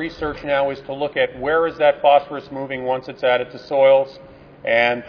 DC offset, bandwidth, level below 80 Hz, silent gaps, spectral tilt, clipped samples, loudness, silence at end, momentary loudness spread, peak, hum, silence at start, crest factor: under 0.1%; 5.4 kHz; -50 dBFS; none; -6.5 dB/octave; under 0.1%; -19 LUFS; 0 s; 13 LU; -2 dBFS; none; 0 s; 18 dB